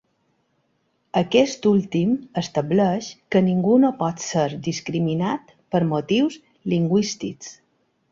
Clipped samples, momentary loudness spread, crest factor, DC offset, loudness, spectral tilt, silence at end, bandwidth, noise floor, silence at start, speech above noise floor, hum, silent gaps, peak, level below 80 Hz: under 0.1%; 10 LU; 18 dB; under 0.1%; -22 LUFS; -6 dB/octave; 0.6 s; 7.6 kHz; -69 dBFS; 1.15 s; 48 dB; none; none; -4 dBFS; -60 dBFS